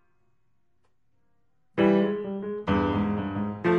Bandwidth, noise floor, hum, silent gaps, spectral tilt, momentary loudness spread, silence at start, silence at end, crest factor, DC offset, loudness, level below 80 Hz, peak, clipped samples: 6.2 kHz; -75 dBFS; none; none; -9 dB/octave; 10 LU; 1.75 s; 0 s; 18 dB; under 0.1%; -26 LUFS; -50 dBFS; -10 dBFS; under 0.1%